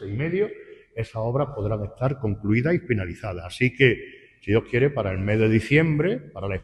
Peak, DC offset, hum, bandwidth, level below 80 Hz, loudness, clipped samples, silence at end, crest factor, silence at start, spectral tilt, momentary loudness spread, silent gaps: -4 dBFS; under 0.1%; none; 11.5 kHz; -48 dBFS; -24 LUFS; under 0.1%; 0 s; 20 dB; 0 s; -8 dB/octave; 13 LU; none